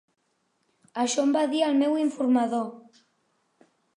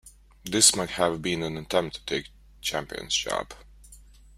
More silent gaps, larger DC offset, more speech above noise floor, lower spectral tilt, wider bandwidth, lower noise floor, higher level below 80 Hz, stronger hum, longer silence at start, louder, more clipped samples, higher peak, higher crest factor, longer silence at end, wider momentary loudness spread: neither; neither; first, 49 dB vs 24 dB; first, -3.5 dB/octave vs -2 dB/octave; second, 11 kHz vs 16 kHz; first, -73 dBFS vs -51 dBFS; second, -84 dBFS vs -52 dBFS; neither; first, 0.95 s vs 0.05 s; about the same, -25 LUFS vs -25 LUFS; neither; second, -12 dBFS vs -4 dBFS; second, 16 dB vs 24 dB; first, 1.2 s vs 0.35 s; second, 8 LU vs 14 LU